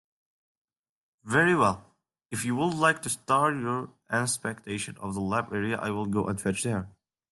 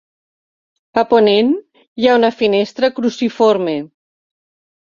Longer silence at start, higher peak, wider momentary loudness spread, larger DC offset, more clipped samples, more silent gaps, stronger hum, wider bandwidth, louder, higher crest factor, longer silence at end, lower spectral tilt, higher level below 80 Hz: first, 1.25 s vs 0.95 s; second, -8 dBFS vs -2 dBFS; about the same, 10 LU vs 10 LU; neither; neither; second, none vs 1.87-1.96 s; neither; first, 12.5 kHz vs 7.4 kHz; second, -28 LUFS vs -15 LUFS; about the same, 20 dB vs 16 dB; second, 0.45 s vs 1.1 s; about the same, -4.5 dB/octave vs -5.5 dB/octave; second, -66 dBFS vs -60 dBFS